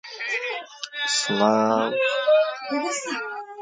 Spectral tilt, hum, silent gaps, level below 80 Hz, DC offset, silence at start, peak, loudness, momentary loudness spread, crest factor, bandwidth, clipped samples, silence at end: -3 dB/octave; none; none; -76 dBFS; under 0.1%; 0.05 s; -6 dBFS; -23 LUFS; 11 LU; 18 dB; 9.6 kHz; under 0.1%; 0 s